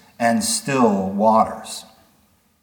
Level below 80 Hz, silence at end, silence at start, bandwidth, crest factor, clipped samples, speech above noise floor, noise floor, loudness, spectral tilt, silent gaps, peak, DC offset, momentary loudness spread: -62 dBFS; 0.8 s; 0.2 s; 19 kHz; 18 dB; under 0.1%; 41 dB; -59 dBFS; -18 LUFS; -4 dB/octave; none; -2 dBFS; under 0.1%; 15 LU